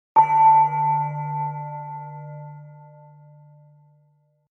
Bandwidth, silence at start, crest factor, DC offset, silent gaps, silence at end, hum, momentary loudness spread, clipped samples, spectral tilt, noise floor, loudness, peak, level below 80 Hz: 3.1 kHz; 0.15 s; 18 dB; under 0.1%; none; 1.75 s; none; 24 LU; under 0.1%; -8.5 dB/octave; -63 dBFS; -19 LUFS; -4 dBFS; -78 dBFS